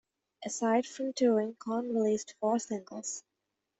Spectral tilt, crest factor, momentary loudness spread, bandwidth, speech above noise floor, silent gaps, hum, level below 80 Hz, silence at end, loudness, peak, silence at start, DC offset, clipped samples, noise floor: -4.5 dB/octave; 18 dB; 11 LU; 8.4 kHz; 54 dB; none; none; -78 dBFS; 0.6 s; -32 LUFS; -16 dBFS; 0.4 s; under 0.1%; under 0.1%; -85 dBFS